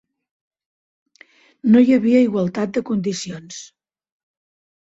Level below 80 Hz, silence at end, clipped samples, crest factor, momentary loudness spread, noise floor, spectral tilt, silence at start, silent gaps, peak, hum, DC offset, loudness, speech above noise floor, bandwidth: -62 dBFS; 1.2 s; under 0.1%; 18 dB; 19 LU; -52 dBFS; -6 dB/octave; 1.65 s; none; -4 dBFS; none; under 0.1%; -17 LUFS; 35 dB; 8 kHz